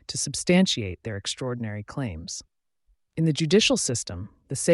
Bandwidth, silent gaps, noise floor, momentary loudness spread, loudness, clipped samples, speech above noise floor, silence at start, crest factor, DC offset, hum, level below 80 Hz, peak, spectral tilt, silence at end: 11.5 kHz; none; -68 dBFS; 15 LU; -25 LUFS; under 0.1%; 43 dB; 0.1 s; 16 dB; under 0.1%; none; -54 dBFS; -10 dBFS; -4 dB/octave; 0 s